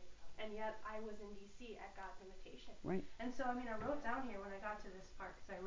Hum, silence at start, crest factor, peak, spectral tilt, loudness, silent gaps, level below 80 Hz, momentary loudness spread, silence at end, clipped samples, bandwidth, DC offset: none; 0 s; 16 dB; -30 dBFS; -5.5 dB/octave; -48 LUFS; none; -62 dBFS; 14 LU; 0 s; under 0.1%; 7.6 kHz; under 0.1%